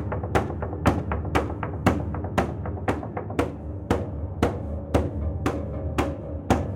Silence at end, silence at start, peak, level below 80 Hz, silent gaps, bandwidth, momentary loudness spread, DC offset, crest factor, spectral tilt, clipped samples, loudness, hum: 0 s; 0 s; -6 dBFS; -36 dBFS; none; 16.5 kHz; 6 LU; under 0.1%; 20 dB; -7 dB/octave; under 0.1%; -27 LUFS; none